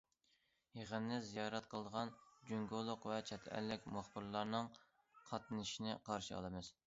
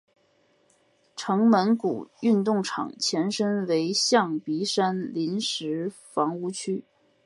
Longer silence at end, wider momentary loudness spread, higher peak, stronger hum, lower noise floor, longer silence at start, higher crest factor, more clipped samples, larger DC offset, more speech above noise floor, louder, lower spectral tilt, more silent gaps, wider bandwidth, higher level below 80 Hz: second, 0.15 s vs 0.45 s; second, 6 LU vs 10 LU; second, -26 dBFS vs -6 dBFS; neither; first, -81 dBFS vs -65 dBFS; second, 0.75 s vs 1.15 s; about the same, 22 dB vs 20 dB; neither; neither; second, 35 dB vs 40 dB; second, -46 LUFS vs -25 LUFS; about the same, -4 dB/octave vs -4.5 dB/octave; neither; second, 7.6 kHz vs 11.5 kHz; first, -72 dBFS vs -78 dBFS